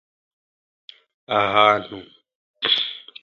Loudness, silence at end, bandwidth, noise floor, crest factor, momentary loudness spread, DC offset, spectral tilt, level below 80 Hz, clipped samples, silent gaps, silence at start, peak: -19 LUFS; 0.25 s; 7.2 kHz; under -90 dBFS; 24 dB; 17 LU; under 0.1%; -4.5 dB/octave; -64 dBFS; under 0.1%; 2.35-2.54 s; 1.3 s; 0 dBFS